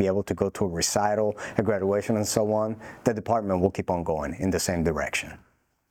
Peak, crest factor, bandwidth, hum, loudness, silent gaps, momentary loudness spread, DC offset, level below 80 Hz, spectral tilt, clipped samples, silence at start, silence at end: -8 dBFS; 18 dB; 19 kHz; none; -26 LUFS; none; 5 LU; under 0.1%; -52 dBFS; -5 dB/octave; under 0.1%; 0 s; 0.55 s